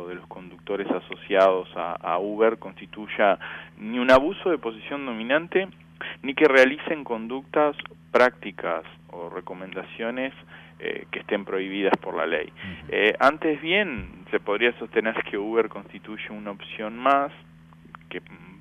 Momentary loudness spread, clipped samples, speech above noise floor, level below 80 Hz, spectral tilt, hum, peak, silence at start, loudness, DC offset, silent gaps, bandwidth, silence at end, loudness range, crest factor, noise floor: 18 LU; under 0.1%; 23 dB; -58 dBFS; -5.5 dB/octave; none; -6 dBFS; 0 s; -24 LUFS; under 0.1%; none; 11.5 kHz; 0.05 s; 6 LU; 20 dB; -48 dBFS